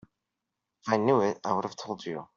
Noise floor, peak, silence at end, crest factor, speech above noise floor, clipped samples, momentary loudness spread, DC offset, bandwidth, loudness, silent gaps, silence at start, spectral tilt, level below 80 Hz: -86 dBFS; -8 dBFS; 0.1 s; 22 dB; 57 dB; under 0.1%; 12 LU; under 0.1%; 7.4 kHz; -29 LUFS; none; 0.85 s; -5 dB/octave; -72 dBFS